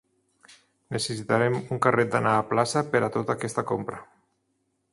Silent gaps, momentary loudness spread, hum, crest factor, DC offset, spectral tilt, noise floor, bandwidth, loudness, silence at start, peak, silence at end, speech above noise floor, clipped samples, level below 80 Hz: none; 8 LU; none; 22 dB; under 0.1%; -5 dB/octave; -74 dBFS; 11.5 kHz; -25 LUFS; 0.9 s; -4 dBFS; 0.9 s; 49 dB; under 0.1%; -64 dBFS